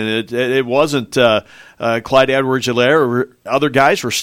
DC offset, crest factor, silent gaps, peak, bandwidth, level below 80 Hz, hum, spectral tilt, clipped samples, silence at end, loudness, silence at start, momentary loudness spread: under 0.1%; 16 dB; none; 0 dBFS; 16.5 kHz; -52 dBFS; none; -4.5 dB/octave; under 0.1%; 0 s; -15 LUFS; 0 s; 7 LU